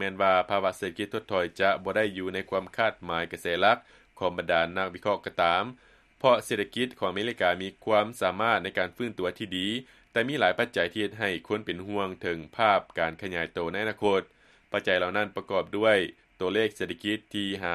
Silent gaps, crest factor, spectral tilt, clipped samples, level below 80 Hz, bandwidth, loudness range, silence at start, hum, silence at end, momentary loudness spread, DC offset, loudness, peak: none; 22 dB; -4.5 dB/octave; under 0.1%; -64 dBFS; 13.5 kHz; 2 LU; 0 s; none; 0 s; 8 LU; under 0.1%; -28 LUFS; -6 dBFS